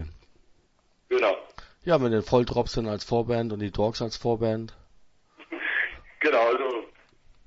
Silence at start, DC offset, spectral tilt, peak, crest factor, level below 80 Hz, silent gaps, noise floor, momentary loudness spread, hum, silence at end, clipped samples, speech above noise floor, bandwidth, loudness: 0 s; under 0.1%; -6 dB/octave; -8 dBFS; 20 dB; -48 dBFS; none; -65 dBFS; 11 LU; none; 0.6 s; under 0.1%; 40 dB; 8 kHz; -26 LUFS